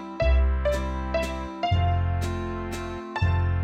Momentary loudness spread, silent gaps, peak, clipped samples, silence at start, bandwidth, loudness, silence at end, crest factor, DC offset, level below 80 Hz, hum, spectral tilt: 9 LU; none; -12 dBFS; under 0.1%; 0 s; 10 kHz; -27 LUFS; 0 s; 12 dB; under 0.1%; -28 dBFS; none; -7 dB/octave